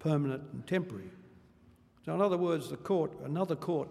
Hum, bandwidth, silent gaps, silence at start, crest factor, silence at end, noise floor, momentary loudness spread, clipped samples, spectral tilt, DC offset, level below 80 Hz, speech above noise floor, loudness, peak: none; 14 kHz; none; 0 s; 18 dB; 0 s; -62 dBFS; 13 LU; under 0.1%; -7.5 dB/octave; under 0.1%; -70 dBFS; 29 dB; -33 LUFS; -16 dBFS